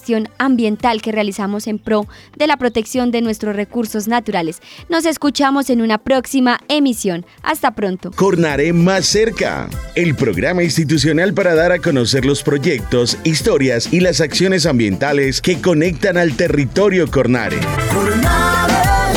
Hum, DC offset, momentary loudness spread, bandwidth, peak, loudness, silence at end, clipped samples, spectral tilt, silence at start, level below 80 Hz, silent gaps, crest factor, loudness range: none; under 0.1%; 7 LU; 19.5 kHz; -2 dBFS; -15 LUFS; 0 s; under 0.1%; -5 dB/octave; 0.05 s; -32 dBFS; none; 12 dB; 3 LU